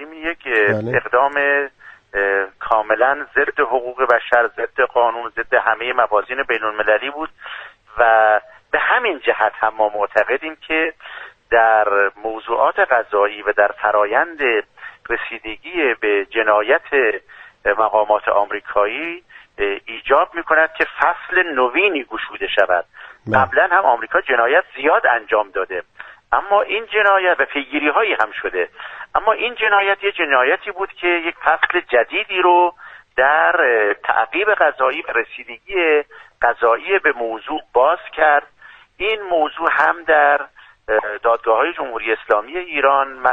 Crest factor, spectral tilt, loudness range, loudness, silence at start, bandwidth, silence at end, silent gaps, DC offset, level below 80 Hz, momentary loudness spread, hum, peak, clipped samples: 18 dB; -6 dB/octave; 2 LU; -17 LUFS; 0 s; 5.8 kHz; 0 s; none; under 0.1%; -52 dBFS; 10 LU; none; 0 dBFS; under 0.1%